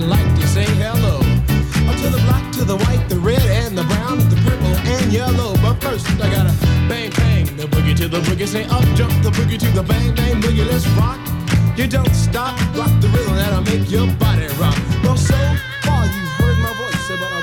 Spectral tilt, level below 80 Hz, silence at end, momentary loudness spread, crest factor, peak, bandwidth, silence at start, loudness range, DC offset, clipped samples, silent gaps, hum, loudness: -6 dB/octave; -24 dBFS; 0 s; 4 LU; 10 dB; -4 dBFS; over 20 kHz; 0 s; 1 LU; under 0.1%; under 0.1%; none; none; -16 LUFS